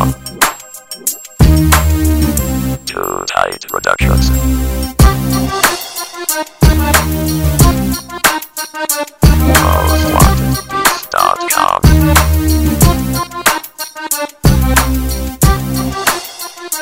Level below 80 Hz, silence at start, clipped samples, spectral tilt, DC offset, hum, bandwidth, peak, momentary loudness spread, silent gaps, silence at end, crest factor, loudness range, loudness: -16 dBFS; 0 s; 0.6%; -4.5 dB/octave; under 0.1%; none; 16.5 kHz; 0 dBFS; 9 LU; none; 0 s; 12 dB; 3 LU; -12 LUFS